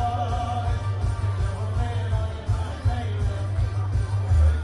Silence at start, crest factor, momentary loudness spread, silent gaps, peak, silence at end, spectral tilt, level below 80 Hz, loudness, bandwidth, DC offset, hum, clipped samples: 0 s; 12 dB; 4 LU; none; -12 dBFS; 0 s; -7 dB/octave; -30 dBFS; -26 LUFS; 11 kHz; under 0.1%; none; under 0.1%